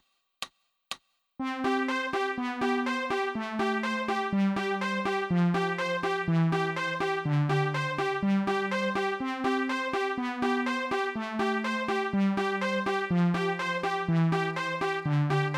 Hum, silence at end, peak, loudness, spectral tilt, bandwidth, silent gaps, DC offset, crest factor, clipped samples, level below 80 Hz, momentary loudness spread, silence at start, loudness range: none; 0 s; -14 dBFS; -29 LUFS; -6.5 dB/octave; 12.5 kHz; none; under 0.1%; 14 dB; under 0.1%; -64 dBFS; 4 LU; 0.4 s; 2 LU